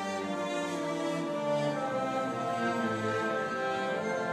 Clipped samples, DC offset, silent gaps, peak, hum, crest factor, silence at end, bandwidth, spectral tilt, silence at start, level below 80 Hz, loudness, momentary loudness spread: under 0.1%; under 0.1%; none; -20 dBFS; none; 12 dB; 0 s; 14.5 kHz; -5 dB/octave; 0 s; -74 dBFS; -32 LUFS; 3 LU